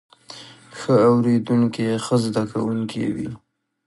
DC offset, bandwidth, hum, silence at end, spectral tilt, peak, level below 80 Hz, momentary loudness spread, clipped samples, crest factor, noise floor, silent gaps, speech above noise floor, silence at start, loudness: under 0.1%; 11.5 kHz; none; 0.5 s; -7 dB/octave; -4 dBFS; -58 dBFS; 23 LU; under 0.1%; 16 dB; -42 dBFS; none; 23 dB; 0.3 s; -20 LUFS